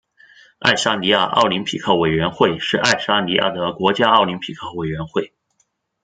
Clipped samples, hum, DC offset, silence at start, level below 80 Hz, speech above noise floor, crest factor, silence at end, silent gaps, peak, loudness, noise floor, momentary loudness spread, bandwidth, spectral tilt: under 0.1%; none; under 0.1%; 0.6 s; -52 dBFS; 49 dB; 18 dB; 0.8 s; none; 0 dBFS; -18 LUFS; -67 dBFS; 11 LU; 9.4 kHz; -4 dB/octave